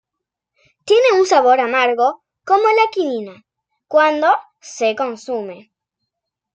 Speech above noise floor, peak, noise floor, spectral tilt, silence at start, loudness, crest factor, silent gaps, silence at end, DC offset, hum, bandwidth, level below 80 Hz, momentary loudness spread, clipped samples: 67 dB; -2 dBFS; -82 dBFS; -2.5 dB/octave; 0.85 s; -16 LUFS; 16 dB; none; 0.95 s; under 0.1%; none; 9.2 kHz; -66 dBFS; 17 LU; under 0.1%